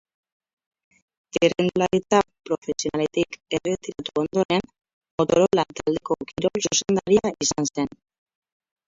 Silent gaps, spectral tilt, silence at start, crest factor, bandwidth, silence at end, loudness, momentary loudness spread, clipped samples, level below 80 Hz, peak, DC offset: 2.58-2.62 s, 4.45-4.49 s, 4.93-5.01 s, 5.11-5.18 s; -4 dB/octave; 1.35 s; 20 dB; 7.8 kHz; 1.05 s; -23 LUFS; 9 LU; under 0.1%; -56 dBFS; -4 dBFS; under 0.1%